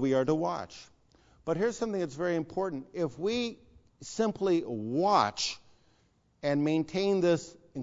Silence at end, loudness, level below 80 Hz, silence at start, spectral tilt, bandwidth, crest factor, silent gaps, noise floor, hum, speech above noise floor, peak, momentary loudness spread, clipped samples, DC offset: 0 s; -30 LUFS; -64 dBFS; 0 s; -5.5 dB/octave; 7.8 kHz; 20 dB; none; -68 dBFS; none; 39 dB; -10 dBFS; 14 LU; under 0.1%; under 0.1%